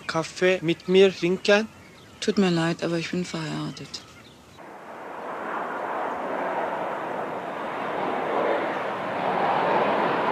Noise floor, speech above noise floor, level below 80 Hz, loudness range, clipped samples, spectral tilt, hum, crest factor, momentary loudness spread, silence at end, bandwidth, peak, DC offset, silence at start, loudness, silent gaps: -48 dBFS; 25 dB; -66 dBFS; 9 LU; under 0.1%; -5.5 dB/octave; none; 20 dB; 15 LU; 0 s; 13.5 kHz; -6 dBFS; under 0.1%; 0 s; -25 LUFS; none